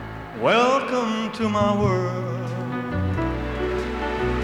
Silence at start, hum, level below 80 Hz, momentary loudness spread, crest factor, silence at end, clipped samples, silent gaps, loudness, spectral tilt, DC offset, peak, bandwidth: 0 s; none; -38 dBFS; 9 LU; 18 dB; 0 s; under 0.1%; none; -23 LUFS; -6.5 dB/octave; under 0.1%; -6 dBFS; 11.5 kHz